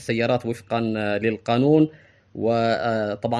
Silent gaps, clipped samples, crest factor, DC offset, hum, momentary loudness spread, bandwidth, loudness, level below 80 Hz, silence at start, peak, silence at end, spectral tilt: none; under 0.1%; 16 dB; under 0.1%; none; 7 LU; 12 kHz; -22 LUFS; -60 dBFS; 0 s; -6 dBFS; 0 s; -7 dB/octave